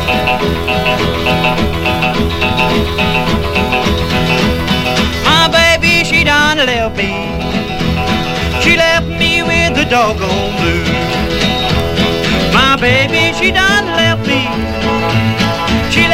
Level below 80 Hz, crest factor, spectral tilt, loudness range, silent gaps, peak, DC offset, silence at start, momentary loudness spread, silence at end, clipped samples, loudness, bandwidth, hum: -24 dBFS; 12 dB; -4.5 dB/octave; 3 LU; none; 0 dBFS; under 0.1%; 0 s; 6 LU; 0 s; under 0.1%; -11 LUFS; 16.5 kHz; none